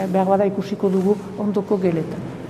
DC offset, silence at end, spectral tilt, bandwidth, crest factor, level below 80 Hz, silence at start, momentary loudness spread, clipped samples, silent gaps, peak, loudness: under 0.1%; 0 s; -8.5 dB/octave; 13 kHz; 16 dB; -56 dBFS; 0 s; 5 LU; under 0.1%; none; -4 dBFS; -21 LUFS